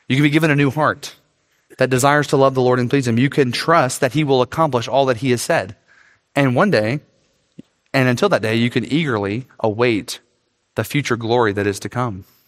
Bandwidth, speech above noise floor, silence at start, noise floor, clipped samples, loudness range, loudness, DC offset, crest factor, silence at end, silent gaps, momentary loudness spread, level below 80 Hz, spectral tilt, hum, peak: 16 kHz; 49 dB; 0.1 s; -66 dBFS; under 0.1%; 4 LU; -17 LUFS; under 0.1%; 18 dB; 0.25 s; none; 9 LU; -58 dBFS; -5.5 dB/octave; none; 0 dBFS